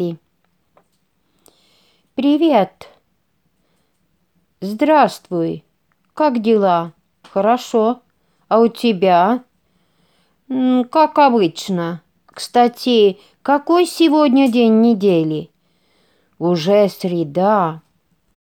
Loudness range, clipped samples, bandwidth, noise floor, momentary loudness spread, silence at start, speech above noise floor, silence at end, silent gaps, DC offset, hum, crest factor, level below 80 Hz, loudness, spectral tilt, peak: 7 LU; under 0.1%; 17.5 kHz; -66 dBFS; 13 LU; 0 s; 51 dB; 0.75 s; none; under 0.1%; none; 16 dB; -68 dBFS; -16 LUFS; -6 dB/octave; 0 dBFS